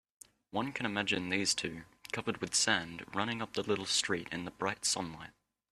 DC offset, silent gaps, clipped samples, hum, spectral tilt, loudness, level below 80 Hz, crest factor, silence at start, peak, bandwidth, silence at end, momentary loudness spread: under 0.1%; none; under 0.1%; none; -2 dB/octave; -34 LUFS; -68 dBFS; 24 dB; 0.55 s; -12 dBFS; 14 kHz; 0.4 s; 11 LU